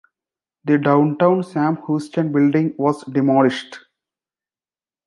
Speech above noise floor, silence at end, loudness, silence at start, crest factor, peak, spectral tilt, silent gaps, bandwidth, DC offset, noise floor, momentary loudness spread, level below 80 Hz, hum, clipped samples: over 73 dB; 1.3 s; -18 LUFS; 0.65 s; 18 dB; -2 dBFS; -8 dB/octave; none; 11 kHz; under 0.1%; under -90 dBFS; 7 LU; -68 dBFS; none; under 0.1%